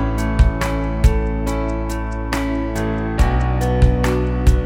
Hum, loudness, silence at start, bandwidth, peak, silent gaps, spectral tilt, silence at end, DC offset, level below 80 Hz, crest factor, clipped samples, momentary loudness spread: none; -19 LUFS; 0 s; 15 kHz; 0 dBFS; none; -7 dB/octave; 0 s; under 0.1%; -18 dBFS; 16 dB; under 0.1%; 6 LU